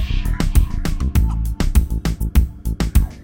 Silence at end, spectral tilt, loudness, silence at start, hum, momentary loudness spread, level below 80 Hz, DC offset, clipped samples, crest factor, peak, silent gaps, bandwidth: 0 s; -6 dB/octave; -20 LUFS; 0 s; none; 4 LU; -18 dBFS; under 0.1%; under 0.1%; 16 dB; 0 dBFS; none; 17 kHz